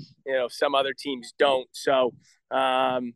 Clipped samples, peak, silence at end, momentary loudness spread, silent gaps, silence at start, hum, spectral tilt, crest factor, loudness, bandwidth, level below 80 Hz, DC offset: under 0.1%; -8 dBFS; 0.05 s; 7 LU; none; 0 s; none; -3.5 dB/octave; 18 dB; -25 LUFS; 12.5 kHz; -76 dBFS; under 0.1%